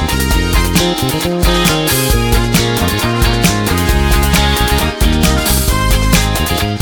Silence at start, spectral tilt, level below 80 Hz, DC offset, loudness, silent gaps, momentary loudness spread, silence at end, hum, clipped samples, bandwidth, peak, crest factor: 0 s; -4 dB/octave; -16 dBFS; under 0.1%; -12 LUFS; none; 3 LU; 0 s; none; under 0.1%; 19.5 kHz; 0 dBFS; 12 dB